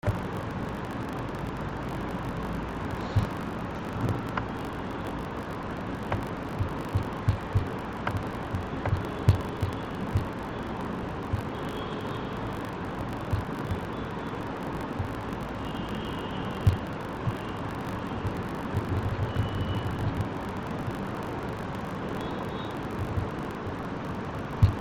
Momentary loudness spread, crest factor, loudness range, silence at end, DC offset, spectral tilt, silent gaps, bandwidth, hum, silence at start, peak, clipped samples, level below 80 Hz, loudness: 5 LU; 22 dB; 3 LU; 0 s; under 0.1%; -7.5 dB/octave; none; 16.5 kHz; none; 0.05 s; -8 dBFS; under 0.1%; -44 dBFS; -32 LUFS